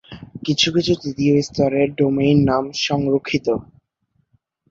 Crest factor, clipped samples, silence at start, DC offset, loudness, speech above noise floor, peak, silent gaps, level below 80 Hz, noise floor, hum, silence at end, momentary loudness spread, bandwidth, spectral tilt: 16 dB; under 0.1%; 0.1 s; under 0.1%; -19 LUFS; 49 dB; -4 dBFS; none; -48 dBFS; -67 dBFS; none; 1.05 s; 8 LU; 7.8 kHz; -5.5 dB/octave